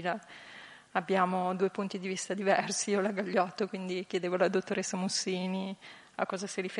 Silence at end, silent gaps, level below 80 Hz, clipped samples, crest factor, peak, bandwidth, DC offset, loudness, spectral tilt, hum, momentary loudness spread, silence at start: 0 s; none; -82 dBFS; under 0.1%; 20 dB; -12 dBFS; 11.5 kHz; under 0.1%; -32 LUFS; -4 dB/octave; none; 12 LU; 0 s